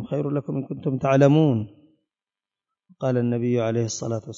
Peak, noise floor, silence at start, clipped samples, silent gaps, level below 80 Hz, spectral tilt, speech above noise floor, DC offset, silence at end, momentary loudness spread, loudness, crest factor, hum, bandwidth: -6 dBFS; under -90 dBFS; 0 s; under 0.1%; none; -62 dBFS; -7 dB/octave; over 68 dB; under 0.1%; 0 s; 11 LU; -23 LUFS; 18 dB; none; 7.6 kHz